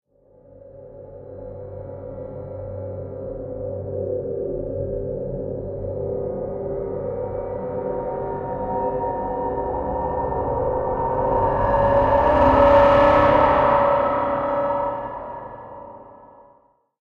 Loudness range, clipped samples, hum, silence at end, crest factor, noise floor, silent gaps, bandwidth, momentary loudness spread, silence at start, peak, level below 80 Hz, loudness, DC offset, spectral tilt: 14 LU; under 0.1%; none; 0.75 s; 20 dB; -58 dBFS; none; 6.4 kHz; 20 LU; 0.55 s; -2 dBFS; -38 dBFS; -21 LUFS; under 0.1%; -8.5 dB/octave